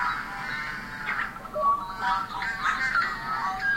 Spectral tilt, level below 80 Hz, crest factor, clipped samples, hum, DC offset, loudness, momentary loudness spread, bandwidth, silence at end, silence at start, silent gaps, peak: -3 dB/octave; -50 dBFS; 16 dB; under 0.1%; none; under 0.1%; -28 LUFS; 7 LU; 16.5 kHz; 0 s; 0 s; none; -12 dBFS